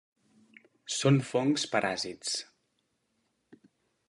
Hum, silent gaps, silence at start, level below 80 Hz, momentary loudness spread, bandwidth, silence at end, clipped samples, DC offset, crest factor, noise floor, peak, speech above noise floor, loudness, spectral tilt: none; none; 0.85 s; -74 dBFS; 11 LU; 11.5 kHz; 1.65 s; under 0.1%; under 0.1%; 22 dB; -77 dBFS; -12 dBFS; 49 dB; -29 LUFS; -4.5 dB/octave